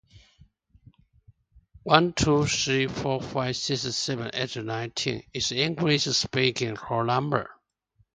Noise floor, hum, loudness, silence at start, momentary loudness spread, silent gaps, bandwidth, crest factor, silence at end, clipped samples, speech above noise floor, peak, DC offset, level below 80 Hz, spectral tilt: -68 dBFS; none; -26 LUFS; 0.15 s; 8 LU; none; 9.6 kHz; 26 dB; 0.65 s; under 0.1%; 42 dB; 0 dBFS; under 0.1%; -52 dBFS; -4 dB/octave